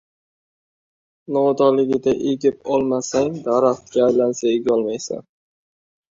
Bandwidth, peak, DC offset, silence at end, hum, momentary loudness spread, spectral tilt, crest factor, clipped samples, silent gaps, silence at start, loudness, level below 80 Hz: 7.8 kHz; -4 dBFS; under 0.1%; 0.9 s; none; 8 LU; -5.5 dB/octave; 16 dB; under 0.1%; none; 1.3 s; -19 LUFS; -58 dBFS